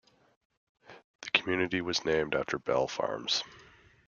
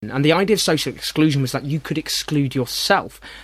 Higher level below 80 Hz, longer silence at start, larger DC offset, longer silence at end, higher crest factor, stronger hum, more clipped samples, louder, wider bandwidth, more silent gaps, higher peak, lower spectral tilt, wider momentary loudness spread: second, -64 dBFS vs -50 dBFS; first, 0.9 s vs 0 s; neither; first, 0.45 s vs 0 s; first, 26 dB vs 18 dB; neither; neither; second, -30 LUFS vs -19 LUFS; second, 7.2 kHz vs 16 kHz; first, 1.04-1.19 s vs none; second, -6 dBFS vs 0 dBFS; about the same, -3.5 dB/octave vs -4.5 dB/octave; about the same, 5 LU vs 7 LU